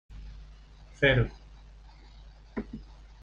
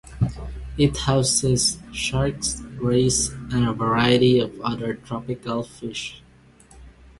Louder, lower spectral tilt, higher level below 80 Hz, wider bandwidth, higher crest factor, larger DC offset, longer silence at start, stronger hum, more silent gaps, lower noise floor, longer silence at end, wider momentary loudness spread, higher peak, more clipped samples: second, -28 LUFS vs -22 LUFS; first, -7 dB/octave vs -4.5 dB/octave; about the same, -44 dBFS vs -40 dBFS; second, 7.4 kHz vs 11.5 kHz; about the same, 24 dB vs 20 dB; neither; about the same, 0.1 s vs 0.05 s; neither; neither; about the same, -51 dBFS vs -51 dBFS; about the same, 0.4 s vs 0.3 s; first, 26 LU vs 12 LU; second, -10 dBFS vs -4 dBFS; neither